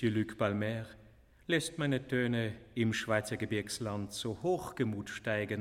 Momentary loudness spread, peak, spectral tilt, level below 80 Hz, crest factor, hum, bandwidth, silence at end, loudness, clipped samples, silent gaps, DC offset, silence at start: 6 LU; -14 dBFS; -5.5 dB/octave; -62 dBFS; 20 dB; none; 15.5 kHz; 0 s; -35 LUFS; under 0.1%; none; under 0.1%; 0 s